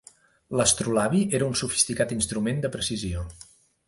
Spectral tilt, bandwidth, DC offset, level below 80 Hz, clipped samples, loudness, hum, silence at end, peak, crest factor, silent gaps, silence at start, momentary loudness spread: -3.5 dB/octave; 11.5 kHz; under 0.1%; -46 dBFS; under 0.1%; -25 LUFS; none; 0.45 s; -6 dBFS; 22 dB; none; 0.5 s; 9 LU